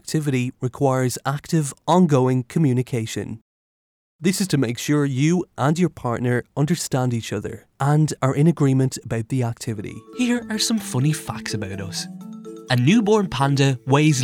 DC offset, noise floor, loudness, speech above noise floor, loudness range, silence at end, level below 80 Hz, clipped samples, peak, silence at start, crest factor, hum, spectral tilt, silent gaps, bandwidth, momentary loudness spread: under 0.1%; under -90 dBFS; -21 LUFS; over 70 dB; 3 LU; 0 s; -56 dBFS; under 0.1%; -4 dBFS; 0.05 s; 16 dB; none; -6 dB/octave; 3.41-4.19 s; 16.5 kHz; 12 LU